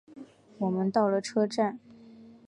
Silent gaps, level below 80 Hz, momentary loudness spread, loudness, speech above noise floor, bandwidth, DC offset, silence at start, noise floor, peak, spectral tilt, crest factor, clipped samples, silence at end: none; -76 dBFS; 7 LU; -28 LUFS; 24 dB; 11 kHz; under 0.1%; 0.1 s; -52 dBFS; -12 dBFS; -6.5 dB/octave; 18 dB; under 0.1%; 0.15 s